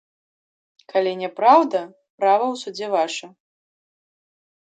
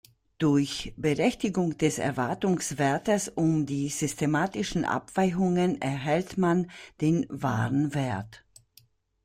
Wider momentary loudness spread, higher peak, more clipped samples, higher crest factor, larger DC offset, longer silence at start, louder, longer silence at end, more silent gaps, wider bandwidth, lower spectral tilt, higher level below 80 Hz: first, 13 LU vs 5 LU; first, -2 dBFS vs -10 dBFS; neither; about the same, 20 dB vs 16 dB; neither; first, 0.95 s vs 0.4 s; first, -20 LUFS vs -27 LUFS; first, 1.35 s vs 0.9 s; first, 2.10-2.18 s vs none; second, 9.2 kHz vs 16 kHz; second, -4 dB/octave vs -5.5 dB/octave; second, -84 dBFS vs -56 dBFS